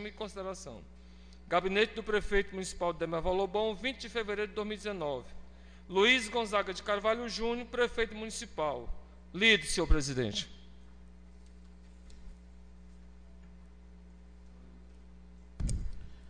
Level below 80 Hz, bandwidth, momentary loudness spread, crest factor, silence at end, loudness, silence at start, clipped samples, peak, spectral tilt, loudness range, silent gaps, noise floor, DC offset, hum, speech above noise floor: -44 dBFS; 10 kHz; 16 LU; 24 dB; 0 s; -32 LUFS; 0 s; under 0.1%; -10 dBFS; -3.5 dB/octave; 8 LU; none; -54 dBFS; 0.1%; none; 22 dB